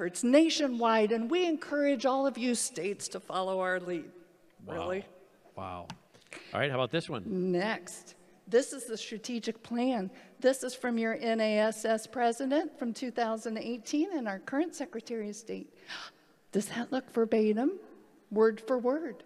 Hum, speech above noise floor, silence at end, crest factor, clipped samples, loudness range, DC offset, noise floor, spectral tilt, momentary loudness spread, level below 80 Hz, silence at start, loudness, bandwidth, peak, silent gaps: none; 25 dB; 0.05 s; 20 dB; under 0.1%; 6 LU; under 0.1%; -56 dBFS; -4.5 dB/octave; 15 LU; -80 dBFS; 0 s; -31 LUFS; 14.5 kHz; -12 dBFS; none